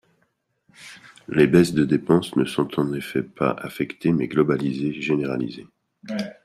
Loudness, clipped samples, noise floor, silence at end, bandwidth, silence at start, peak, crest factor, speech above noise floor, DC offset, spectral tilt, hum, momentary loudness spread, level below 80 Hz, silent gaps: -22 LUFS; under 0.1%; -70 dBFS; 0.15 s; 14.5 kHz; 0.8 s; -4 dBFS; 20 dB; 49 dB; under 0.1%; -7 dB/octave; none; 15 LU; -56 dBFS; none